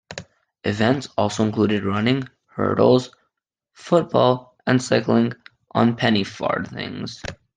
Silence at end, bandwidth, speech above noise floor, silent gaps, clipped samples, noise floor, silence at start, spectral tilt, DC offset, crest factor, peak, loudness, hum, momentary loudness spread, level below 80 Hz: 0.25 s; 9.6 kHz; 57 dB; none; under 0.1%; -77 dBFS; 0.1 s; -6 dB/octave; under 0.1%; 18 dB; -2 dBFS; -21 LUFS; none; 14 LU; -56 dBFS